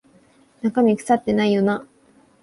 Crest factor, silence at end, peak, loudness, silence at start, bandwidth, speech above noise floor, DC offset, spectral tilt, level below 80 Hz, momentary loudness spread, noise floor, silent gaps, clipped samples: 16 dB; 0.6 s; -6 dBFS; -20 LUFS; 0.65 s; 11.5 kHz; 37 dB; under 0.1%; -6.5 dB/octave; -58 dBFS; 8 LU; -55 dBFS; none; under 0.1%